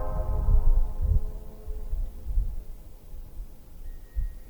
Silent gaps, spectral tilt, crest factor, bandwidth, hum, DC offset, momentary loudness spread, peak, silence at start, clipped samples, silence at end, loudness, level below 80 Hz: none; -8.5 dB/octave; 16 dB; 19.5 kHz; none; 0.2%; 21 LU; -10 dBFS; 0 s; under 0.1%; 0 s; -32 LUFS; -26 dBFS